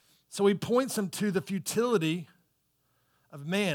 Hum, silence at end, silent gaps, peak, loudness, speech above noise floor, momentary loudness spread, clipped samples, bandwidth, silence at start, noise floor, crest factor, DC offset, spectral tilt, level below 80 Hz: none; 0 s; none; -14 dBFS; -29 LUFS; 45 dB; 8 LU; under 0.1%; 19 kHz; 0.3 s; -74 dBFS; 18 dB; under 0.1%; -5 dB/octave; -74 dBFS